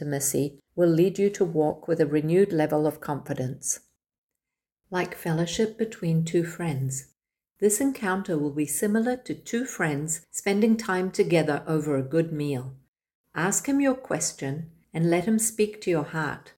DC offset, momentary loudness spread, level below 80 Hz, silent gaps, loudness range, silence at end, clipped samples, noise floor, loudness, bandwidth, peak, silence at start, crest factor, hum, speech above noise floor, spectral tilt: under 0.1%; 9 LU; -62 dBFS; 4.18-4.29 s, 12.88-12.93 s, 13.15-13.24 s; 4 LU; 0.1 s; under 0.1%; -88 dBFS; -26 LUFS; 17 kHz; -10 dBFS; 0 s; 16 dB; none; 63 dB; -5 dB/octave